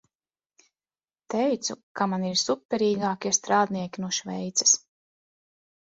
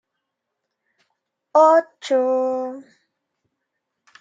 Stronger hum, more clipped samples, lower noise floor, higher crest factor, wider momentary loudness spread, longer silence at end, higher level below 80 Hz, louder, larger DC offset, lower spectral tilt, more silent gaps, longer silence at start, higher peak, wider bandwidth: neither; neither; first, under -90 dBFS vs -80 dBFS; about the same, 22 dB vs 20 dB; second, 9 LU vs 16 LU; second, 1.2 s vs 1.4 s; first, -72 dBFS vs -88 dBFS; second, -25 LUFS vs -18 LUFS; neither; about the same, -2.5 dB/octave vs -3 dB/octave; first, 1.83-1.95 s, 2.65-2.69 s vs none; second, 1.3 s vs 1.55 s; second, -8 dBFS vs -4 dBFS; about the same, 8 kHz vs 7.8 kHz